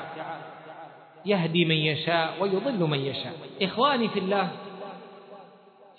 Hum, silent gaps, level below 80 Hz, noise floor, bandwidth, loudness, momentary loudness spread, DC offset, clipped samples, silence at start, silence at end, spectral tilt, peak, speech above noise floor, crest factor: none; none; -76 dBFS; -53 dBFS; 4.6 kHz; -26 LUFS; 21 LU; under 0.1%; under 0.1%; 0 s; 0.15 s; -8.5 dB/octave; -8 dBFS; 27 dB; 20 dB